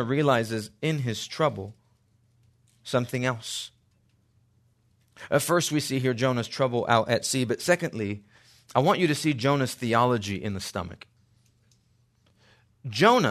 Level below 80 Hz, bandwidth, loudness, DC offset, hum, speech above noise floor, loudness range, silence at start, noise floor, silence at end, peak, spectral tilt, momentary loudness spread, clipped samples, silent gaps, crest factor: -66 dBFS; 13.5 kHz; -26 LUFS; under 0.1%; none; 40 dB; 7 LU; 0 s; -66 dBFS; 0 s; -4 dBFS; -5 dB/octave; 12 LU; under 0.1%; none; 22 dB